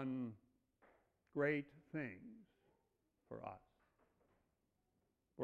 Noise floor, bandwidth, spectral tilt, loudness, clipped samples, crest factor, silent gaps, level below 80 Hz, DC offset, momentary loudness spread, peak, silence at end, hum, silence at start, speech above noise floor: -85 dBFS; 6.8 kHz; -6.5 dB/octave; -46 LUFS; under 0.1%; 22 dB; none; -82 dBFS; under 0.1%; 24 LU; -26 dBFS; 0 s; none; 0 s; 41 dB